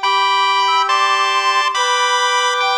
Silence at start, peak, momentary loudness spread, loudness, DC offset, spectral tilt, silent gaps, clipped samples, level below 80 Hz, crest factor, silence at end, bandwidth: 0 s; -2 dBFS; 1 LU; -14 LUFS; under 0.1%; 3.5 dB/octave; none; under 0.1%; -64 dBFS; 12 dB; 0 s; 18.5 kHz